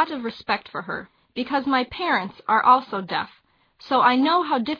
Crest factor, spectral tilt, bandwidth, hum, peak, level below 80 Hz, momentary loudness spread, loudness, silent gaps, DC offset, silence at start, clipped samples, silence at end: 20 dB; -6.5 dB/octave; 5.4 kHz; none; -4 dBFS; -62 dBFS; 14 LU; -22 LUFS; none; under 0.1%; 0 s; under 0.1%; 0 s